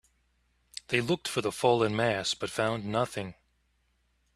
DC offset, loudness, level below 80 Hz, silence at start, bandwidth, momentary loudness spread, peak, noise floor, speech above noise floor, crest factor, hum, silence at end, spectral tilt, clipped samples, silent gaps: under 0.1%; -29 LUFS; -64 dBFS; 0.9 s; 14 kHz; 14 LU; -8 dBFS; -72 dBFS; 43 dB; 24 dB; 60 Hz at -55 dBFS; 1.05 s; -4.5 dB/octave; under 0.1%; none